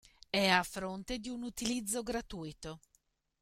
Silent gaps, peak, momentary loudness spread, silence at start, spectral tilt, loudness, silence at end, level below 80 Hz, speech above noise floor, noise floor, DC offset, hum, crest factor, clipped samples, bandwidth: none; -14 dBFS; 17 LU; 0.35 s; -3 dB/octave; -35 LUFS; 0.65 s; -58 dBFS; 40 dB; -76 dBFS; under 0.1%; none; 24 dB; under 0.1%; 16.5 kHz